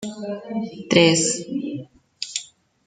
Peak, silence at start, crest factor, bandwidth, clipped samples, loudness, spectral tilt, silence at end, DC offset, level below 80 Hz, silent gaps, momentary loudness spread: -2 dBFS; 0 s; 22 dB; 9.6 kHz; under 0.1%; -21 LUFS; -3.5 dB/octave; 0.4 s; under 0.1%; -62 dBFS; none; 16 LU